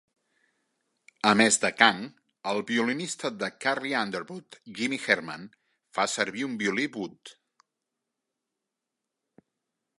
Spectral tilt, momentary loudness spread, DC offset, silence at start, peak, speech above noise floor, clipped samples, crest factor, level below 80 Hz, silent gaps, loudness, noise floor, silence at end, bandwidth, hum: -2.5 dB/octave; 18 LU; under 0.1%; 1.25 s; -2 dBFS; 58 dB; under 0.1%; 28 dB; -76 dBFS; none; -26 LUFS; -86 dBFS; 2.7 s; 11.5 kHz; none